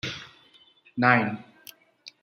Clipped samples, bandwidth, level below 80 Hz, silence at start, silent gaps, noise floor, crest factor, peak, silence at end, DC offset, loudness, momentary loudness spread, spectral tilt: under 0.1%; 16 kHz; -68 dBFS; 0.05 s; none; -58 dBFS; 26 dB; -2 dBFS; 0.15 s; under 0.1%; -23 LUFS; 19 LU; -6 dB/octave